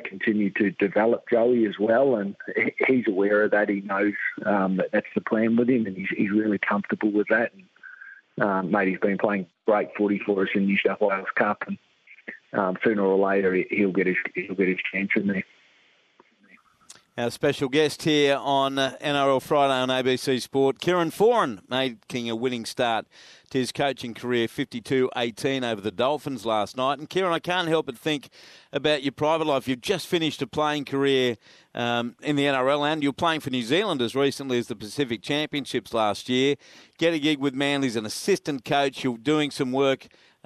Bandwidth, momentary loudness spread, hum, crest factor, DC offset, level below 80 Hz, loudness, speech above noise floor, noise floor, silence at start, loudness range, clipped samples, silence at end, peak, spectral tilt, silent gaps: 13.5 kHz; 7 LU; none; 20 dB; under 0.1%; -68 dBFS; -24 LUFS; 37 dB; -61 dBFS; 0 s; 4 LU; under 0.1%; 0.5 s; -4 dBFS; -5 dB/octave; none